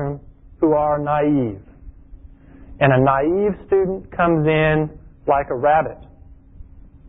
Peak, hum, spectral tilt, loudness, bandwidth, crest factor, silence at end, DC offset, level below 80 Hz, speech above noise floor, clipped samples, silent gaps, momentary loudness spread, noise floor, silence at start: -2 dBFS; none; -12.5 dB/octave; -19 LUFS; 3.9 kHz; 18 dB; 0.3 s; under 0.1%; -42 dBFS; 26 dB; under 0.1%; none; 12 LU; -44 dBFS; 0 s